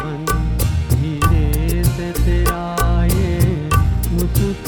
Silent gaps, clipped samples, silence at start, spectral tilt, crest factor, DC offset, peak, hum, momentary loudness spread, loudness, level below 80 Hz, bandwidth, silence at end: none; under 0.1%; 0 s; -6 dB/octave; 14 dB; under 0.1%; -2 dBFS; none; 3 LU; -18 LUFS; -20 dBFS; 20 kHz; 0 s